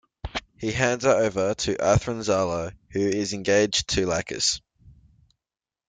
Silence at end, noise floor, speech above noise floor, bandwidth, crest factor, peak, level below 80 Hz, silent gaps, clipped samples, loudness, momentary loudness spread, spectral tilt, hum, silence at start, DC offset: 1 s; under -90 dBFS; over 66 dB; 9.6 kHz; 18 dB; -6 dBFS; -46 dBFS; none; under 0.1%; -24 LUFS; 11 LU; -4 dB/octave; none; 0.25 s; under 0.1%